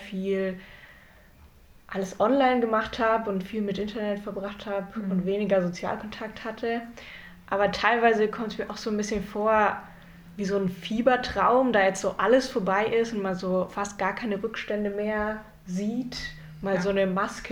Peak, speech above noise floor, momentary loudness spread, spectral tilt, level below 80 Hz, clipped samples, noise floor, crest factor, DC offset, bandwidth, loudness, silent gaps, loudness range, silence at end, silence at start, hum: -6 dBFS; 27 dB; 13 LU; -5.5 dB/octave; -52 dBFS; under 0.1%; -53 dBFS; 20 dB; under 0.1%; 17.5 kHz; -27 LUFS; none; 6 LU; 0 s; 0 s; none